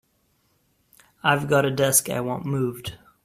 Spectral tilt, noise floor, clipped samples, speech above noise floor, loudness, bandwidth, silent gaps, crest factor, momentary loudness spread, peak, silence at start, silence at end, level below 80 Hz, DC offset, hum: -4 dB/octave; -67 dBFS; under 0.1%; 45 dB; -22 LUFS; 16 kHz; none; 22 dB; 11 LU; -4 dBFS; 1.25 s; 0.3 s; -58 dBFS; under 0.1%; none